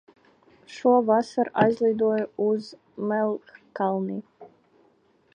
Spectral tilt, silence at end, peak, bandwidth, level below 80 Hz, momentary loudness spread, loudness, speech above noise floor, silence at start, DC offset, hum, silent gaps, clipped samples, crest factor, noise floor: -7 dB/octave; 0.9 s; -6 dBFS; 9.6 kHz; -70 dBFS; 15 LU; -24 LUFS; 39 dB; 0.7 s; under 0.1%; none; none; under 0.1%; 20 dB; -63 dBFS